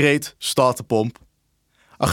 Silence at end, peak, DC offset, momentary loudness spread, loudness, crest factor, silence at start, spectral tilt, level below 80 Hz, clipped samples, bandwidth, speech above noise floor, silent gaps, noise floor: 0 s; -2 dBFS; under 0.1%; 6 LU; -21 LUFS; 20 dB; 0 s; -4.5 dB/octave; -58 dBFS; under 0.1%; 18 kHz; 47 dB; none; -67 dBFS